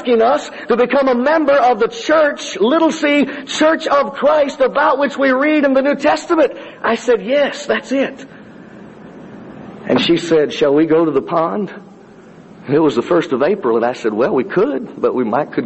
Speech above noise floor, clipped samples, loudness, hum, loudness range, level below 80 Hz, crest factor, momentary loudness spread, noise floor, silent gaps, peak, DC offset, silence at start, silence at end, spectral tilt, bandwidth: 26 dB; under 0.1%; -15 LUFS; none; 5 LU; -56 dBFS; 12 dB; 7 LU; -40 dBFS; none; -2 dBFS; under 0.1%; 0 s; 0 s; -5 dB/octave; 8.4 kHz